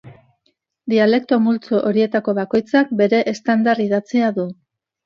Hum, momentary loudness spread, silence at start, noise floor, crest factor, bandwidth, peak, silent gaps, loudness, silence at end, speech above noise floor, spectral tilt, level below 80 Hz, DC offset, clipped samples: none; 5 LU; 0.05 s; -67 dBFS; 16 dB; 7.2 kHz; -2 dBFS; none; -17 LUFS; 0.5 s; 50 dB; -6.5 dB/octave; -64 dBFS; under 0.1%; under 0.1%